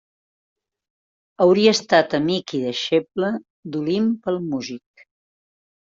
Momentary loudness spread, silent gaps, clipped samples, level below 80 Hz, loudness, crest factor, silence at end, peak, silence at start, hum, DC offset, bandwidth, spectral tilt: 14 LU; 3.50-3.63 s; under 0.1%; -64 dBFS; -20 LUFS; 20 dB; 1.15 s; -2 dBFS; 1.4 s; none; under 0.1%; 7.8 kHz; -5 dB/octave